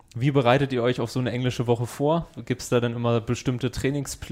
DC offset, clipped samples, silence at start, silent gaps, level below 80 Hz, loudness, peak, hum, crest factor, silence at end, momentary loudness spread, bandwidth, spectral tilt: under 0.1%; under 0.1%; 0.15 s; none; -48 dBFS; -25 LUFS; -6 dBFS; none; 18 dB; 0 s; 6 LU; 16 kHz; -6 dB/octave